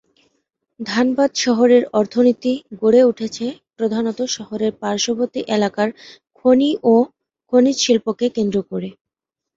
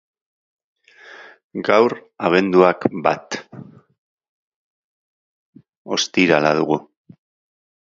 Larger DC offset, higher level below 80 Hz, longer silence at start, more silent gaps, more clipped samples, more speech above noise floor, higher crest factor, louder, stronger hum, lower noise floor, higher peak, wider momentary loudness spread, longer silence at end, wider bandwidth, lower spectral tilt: neither; about the same, -60 dBFS vs -64 dBFS; second, 0.8 s vs 1.1 s; second, none vs 1.44-1.50 s, 3.98-4.18 s, 4.29-5.53 s, 5.77-5.85 s; neither; first, 67 dB vs 26 dB; second, 16 dB vs 22 dB; about the same, -18 LUFS vs -18 LUFS; neither; first, -84 dBFS vs -43 dBFS; about the same, -2 dBFS vs 0 dBFS; about the same, 11 LU vs 11 LU; second, 0.65 s vs 1 s; about the same, 7.8 kHz vs 7.6 kHz; about the same, -4.5 dB/octave vs -4.5 dB/octave